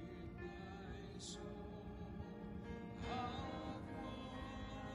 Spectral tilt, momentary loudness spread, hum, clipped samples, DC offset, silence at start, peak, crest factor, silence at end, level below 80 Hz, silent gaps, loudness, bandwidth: -5.5 dB/octave; 7 LU; none; under 0.1%; under 0.1%; 0 s; -32 dBFS; 16 dB; 0 s; -58 dBFS; none; -50 LUFS; 14.5 kHz